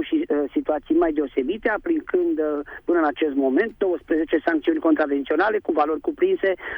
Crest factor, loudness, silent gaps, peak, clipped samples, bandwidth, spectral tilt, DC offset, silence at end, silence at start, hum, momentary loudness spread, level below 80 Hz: 14 dB; -22 LUFS; none; -8 dBFS; under 0.1%; 5.2 kHz; -7.5 dB/octave; under 0.1%; 0 s; 0 s; none; 4 LU; -52 dBFS